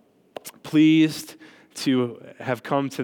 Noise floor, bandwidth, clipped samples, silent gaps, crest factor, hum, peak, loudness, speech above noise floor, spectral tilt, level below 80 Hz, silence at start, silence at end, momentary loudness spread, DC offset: -42 dBFS; 18 kHz; under 0.1%; none; 16 dB; none; -8 dBFS; -22 LUFS; 21 dB; -5.5 dB/octave; -76 dBFS; 0.45 s; 0 s; 23 LU; under 0.1%